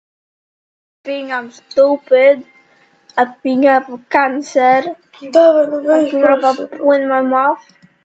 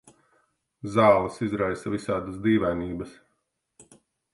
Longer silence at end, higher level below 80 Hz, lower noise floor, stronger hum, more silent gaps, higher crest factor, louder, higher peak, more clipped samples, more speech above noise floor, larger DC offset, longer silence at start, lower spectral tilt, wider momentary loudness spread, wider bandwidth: second, 0.45 s vs 1.2 s; second, -68 dBFS vs -52 dBFS; second, -52 dBFS vs -76 dBFS; neither; neither; second, 14 dB vs 22 dB; first, -14 LUFS vs -25 LUFS; first, 0 dBFS vs -4 dBFS; neither; second, 39 dB vs 52 dB; neither; first, 1.05 s vs 0.85 s; second, -4.5 dB/octave vs -7 dB/octave; second, 13 LU vs 16 LU; second, 8 kHz vs 11.5 kHz